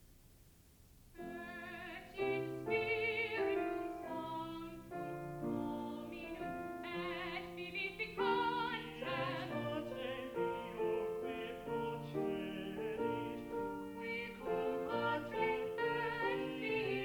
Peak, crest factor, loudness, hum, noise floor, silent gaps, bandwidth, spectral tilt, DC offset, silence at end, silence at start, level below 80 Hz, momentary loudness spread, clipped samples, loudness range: -24 dBFS; 16 dB; -40 LUFS; none; -64 dBFS; none; over 20 kHz; -6 dB/octave; under 0.1%; 0 s; 0 s; -66 dBFS; 10 LU; under 0.1%; 4 LU